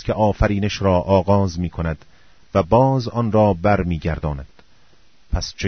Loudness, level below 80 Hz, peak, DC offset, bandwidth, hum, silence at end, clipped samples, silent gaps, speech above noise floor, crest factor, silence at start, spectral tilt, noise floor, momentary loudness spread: -19 LUFS; -32 dBFS; -2 dBFS; 0.4%; 6.6 kHz; none; 0 s; under 0.1%; none; 38 dB; 16 dB; 0 s; -7 dB/octave; -56 dBFS; 11 LU